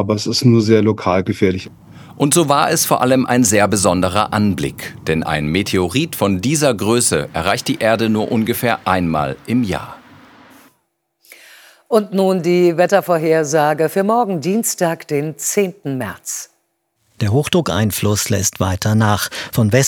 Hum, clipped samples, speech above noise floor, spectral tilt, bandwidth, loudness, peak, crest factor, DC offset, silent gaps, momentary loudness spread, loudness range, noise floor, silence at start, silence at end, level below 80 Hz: none; under 0.1%; 51 dB; -4.5 dB/octave; over 20 kHz; -16 LUFS; 0 dBFS; 16 dB; under 0.1%; none; 8 LU; 5 LU; -67 dBFS; 0 s; 0 s; -50 dBFS